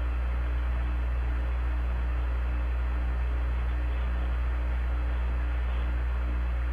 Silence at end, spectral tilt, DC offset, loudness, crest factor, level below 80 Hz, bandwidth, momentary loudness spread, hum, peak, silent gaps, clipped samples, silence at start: 0 s; -8 dB/octave; under 0.1%; -31 LUFS; 6 dB; -28 dBFS; 4.2 kHz; 0 LU; 60 Hz at -30 dBFS; -20 dBFS; none; under 0.1%; 0 s